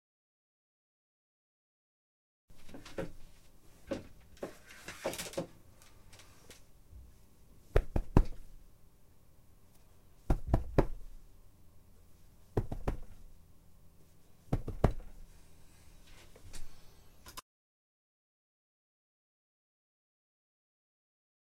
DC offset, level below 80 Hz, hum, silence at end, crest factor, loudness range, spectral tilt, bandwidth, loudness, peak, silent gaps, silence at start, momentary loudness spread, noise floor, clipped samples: under 0.1%; -42 dBFS; none; 4 s; 32 dB; 18 LU; -6.5 dB/octave; 16 kHz; -38 LUFS; -6 dBFS; none; 2.5 s; 28 LU; -62 dBFS; under 0.1%